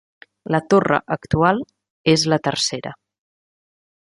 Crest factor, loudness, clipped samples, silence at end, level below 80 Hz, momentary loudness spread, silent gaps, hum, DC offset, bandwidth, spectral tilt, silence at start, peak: 20 dB; -19 LUFS; under 0.1%; 1.2 s; -48 dBFS; 15 LU; 1.90-2.04 s; none; under 0.1%; 11.5 kHz; -4.5 dB/octave; 0.5 s; -2 dBFS